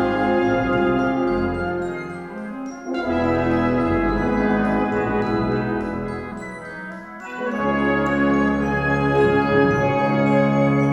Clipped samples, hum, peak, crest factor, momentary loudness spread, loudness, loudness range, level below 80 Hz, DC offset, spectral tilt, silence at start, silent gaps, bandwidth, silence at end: under 0.1%; none; -4 dBFS; 16 dB; 14 LU; -20 LUFS; 5 LU; -38 dBFS; under 0.1%; -8 dB/octave; 0 s; none; 9.4 kHz; 0 s